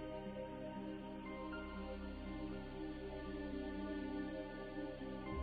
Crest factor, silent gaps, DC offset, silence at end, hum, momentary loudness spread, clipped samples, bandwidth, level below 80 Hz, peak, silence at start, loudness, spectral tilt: 14 dB; none; under 0.1%; 0 s; none; 3 LU; under 0.1%; 4.8 kHz; -56 dBFS; -32 dBFS; 0 s; -47 LUFS; -5.5 dB/octave